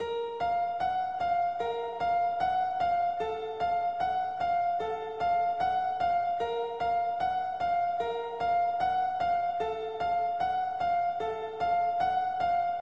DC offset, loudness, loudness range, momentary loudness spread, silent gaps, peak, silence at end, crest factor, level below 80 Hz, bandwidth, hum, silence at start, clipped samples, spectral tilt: 0.1%; -30 LUFS; 0 LU; 4 LU; none; -18 dBFS; 0 s; 12 dB; -60 dBFS; 7.2 kHz; none; 0 s; under 0.1%; -5 dB/octave